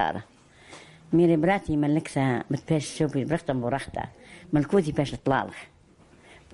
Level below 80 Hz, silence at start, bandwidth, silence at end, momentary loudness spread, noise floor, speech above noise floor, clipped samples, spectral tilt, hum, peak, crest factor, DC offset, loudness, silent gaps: -52 dBFS; 0 s; 11.5 kHz; 0.9 s; 16 LU; -56 dBFS; 31 dB; under 0.1%; -7 dB/octave; none; -10 dBFS; 18 dB; under 0.1%; -26 LUFS; none